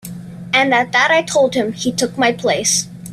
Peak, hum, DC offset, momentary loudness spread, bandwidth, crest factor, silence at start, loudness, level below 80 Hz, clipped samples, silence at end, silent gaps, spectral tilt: -2 dBFS; none; under 0.1%; 6 LU; 15.5 kHz; 16 dB; 0.05 s; -15 LUFS; -54 dBFS; under 0.1%; 0 s; none; -2.5 dB/octave